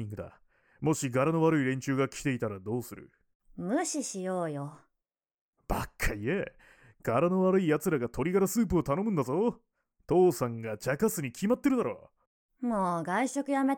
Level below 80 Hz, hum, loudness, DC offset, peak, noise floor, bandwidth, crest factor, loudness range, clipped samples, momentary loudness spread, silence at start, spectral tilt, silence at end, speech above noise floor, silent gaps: -50 dBFS; none; -30 LUFS; under 0.1%; -14 dBFS; -88 dBFS; 18.5 kHz; 16 dB; 7 LU; under 0.1%; 11 LU; 0 s; -6 dB/octave; 0 s; 59 dB; 3.35-3.40 s, 5.41-5.53 s, 12.27-12.49 s